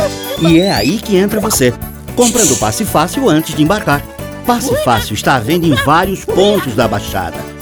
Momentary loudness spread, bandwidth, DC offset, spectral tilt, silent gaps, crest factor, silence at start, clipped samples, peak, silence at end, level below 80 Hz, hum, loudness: 8 LU; over 20 kHz; under 0.1%; -4 dB/octave; none; 12 dB; 0 s; under 0.1%; 0 dBFS; 0 s; -32 dBFS; none; -12 LUFS